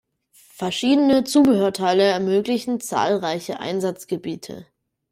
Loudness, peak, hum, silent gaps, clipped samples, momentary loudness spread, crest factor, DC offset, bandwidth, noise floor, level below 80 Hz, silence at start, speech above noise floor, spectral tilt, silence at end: -20 LUFS; -6 dBFS; none; none; under 0.1%; 13 LU; 14 dB; under 0.1%; 15.5 kHz; -55 dBFS; -62 dBFS; 0.6 s; 35 dB; -5 dB/octave; 0.5 s